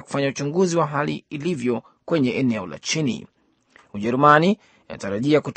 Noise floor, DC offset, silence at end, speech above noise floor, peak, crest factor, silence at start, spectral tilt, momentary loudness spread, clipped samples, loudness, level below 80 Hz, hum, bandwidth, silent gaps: -56 dBFS; under 0.1%; 0.05 s; 35 dB; 0 dBFS; 22 dB; 0.1 s; -5.5 dB/octave; 14 LU; under 0.1%; -21 LUFS; -62 dBFS; none; 8.8 kHz; none